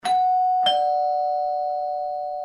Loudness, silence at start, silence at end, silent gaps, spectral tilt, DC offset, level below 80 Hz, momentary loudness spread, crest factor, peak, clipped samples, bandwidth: -22 LUFS; 0.05 s; 0 s; none; -1.5 dB/octave; under 0.1%; -66 dBFS; 8 LU; 14 dB; -8 dBFS; under 0.1%; 11 kHz